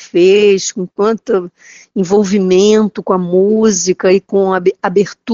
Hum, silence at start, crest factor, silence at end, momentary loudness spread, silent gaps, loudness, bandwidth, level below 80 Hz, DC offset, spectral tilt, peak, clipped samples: none; 0 s; 12 dB; 0 s; 8 LU; none; -12 LUFS; 7.8 kHz; -54 dBFS; under 0.1%; -5.5 dB/octave; 0 dBFS; under 0.1%